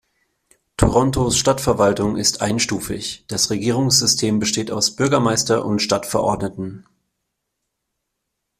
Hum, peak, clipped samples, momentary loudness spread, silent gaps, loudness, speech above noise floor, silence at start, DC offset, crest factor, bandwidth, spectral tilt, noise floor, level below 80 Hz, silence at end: none; 0 dBFS; under 0.1%; 10 LU; none; -18 LUFS; 59 dB; 0.8 s; under 0.1%; 20 dB; 16 kHz; -3.5 dB/octave; -77 dBFS; -40 dBFS; 1.8 s